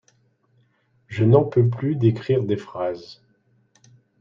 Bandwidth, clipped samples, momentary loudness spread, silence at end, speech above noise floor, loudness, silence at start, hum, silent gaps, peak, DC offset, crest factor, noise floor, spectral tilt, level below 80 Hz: 6.8 kHz; under 0.1%; 12 LU; 1.1 s; 44 dB; -21 LUFS; 1.1 s; none; none; -4 dBFS; under 0.1%; 20 dB; -63 dBFS; -9.5 dB/octave; -60 dBFS